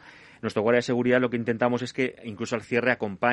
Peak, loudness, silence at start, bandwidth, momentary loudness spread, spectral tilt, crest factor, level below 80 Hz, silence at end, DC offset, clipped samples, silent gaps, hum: -6 dBFS; -26 LUFS; 0.05 s; 11 kHz; 8 LU; -6 dB/octave; 20 dB; -64 dBFS; 0 s; under 0.1%; under 0.1%; none; none